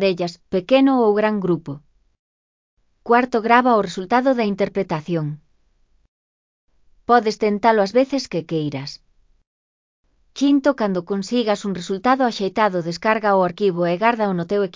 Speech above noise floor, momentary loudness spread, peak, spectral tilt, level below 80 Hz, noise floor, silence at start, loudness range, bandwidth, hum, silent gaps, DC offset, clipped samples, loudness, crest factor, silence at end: 41 dB; 10 LU; 0 dBFS; -6 dB/octave; -60 dBFS; -60 dBFS; 0 s; 4 LU; 7.6 kHz; none; 2.19-2.77 s, 6.08-6.68 s, 9.47-10.03 s; under 0.1%; under 0.1%; -19 LUFS; 20 dB; 0.05 s